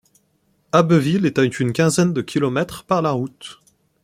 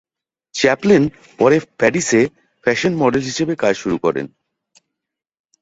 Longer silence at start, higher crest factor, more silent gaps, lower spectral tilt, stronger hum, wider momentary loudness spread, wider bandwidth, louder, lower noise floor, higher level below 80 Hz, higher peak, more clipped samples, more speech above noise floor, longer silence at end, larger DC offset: first, 0.75 s vs 0.55 s; about the same, 18 dB vs 16 dB; neither; about the same, -6 dB/octave vs -5 dB/octave; neither; about the same, 10 LU vs 8 LU; first, 15.5 kHz vs 8 kHz; about the same, -19 LUFS vs -17 LUFS; second, -64 dBFS vs -82 dBFS; about the same, -56 dBFS vs -54 dBFS; about the same, -2 dBFS vs -2 dBFS; neither; second, 46 dB vs 66 dB; second, 0.5 s vs 1.35 s; neither